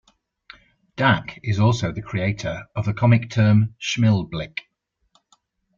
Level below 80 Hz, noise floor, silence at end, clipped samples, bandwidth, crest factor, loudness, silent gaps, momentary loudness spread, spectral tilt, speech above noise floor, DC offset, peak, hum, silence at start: -50 dBFS; -72 dBFS; 1.15 s; under 0.1%; 7.4 kHz; 18 dB; -21 LUFS; none; 11 LU; -6.5 dB/octave; 52 dB; under 0.1%; -4 dBFS; none; 0.95 s